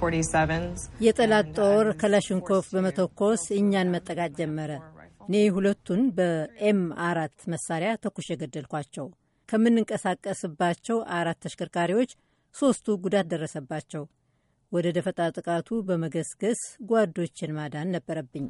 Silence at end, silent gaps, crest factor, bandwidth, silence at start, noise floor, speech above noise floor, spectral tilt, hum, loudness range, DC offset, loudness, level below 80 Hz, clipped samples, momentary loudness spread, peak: 0 s; none; 18 dB; 11.5 kHz; 0 s; -70 dBFS; 44 dB; -5.5 dB/octave; none; 5 LU; under 0.1%; -27 LUFS; -54 dBFS; under 0.1%; 12 LU; -8 dBFS